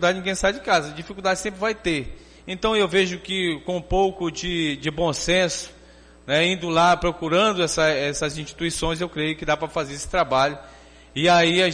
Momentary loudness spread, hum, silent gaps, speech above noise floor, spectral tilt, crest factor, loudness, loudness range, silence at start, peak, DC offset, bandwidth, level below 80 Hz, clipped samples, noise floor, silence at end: 10 LU; none; none; 26 dB; -4 dB/octave; 14 dB; -22 LUFS; 3 LU; 0 s; -8 dBFS; under 0.1%; 10 kHz; -42 dBFS; under 0.1%; -49 dBFS; 0 s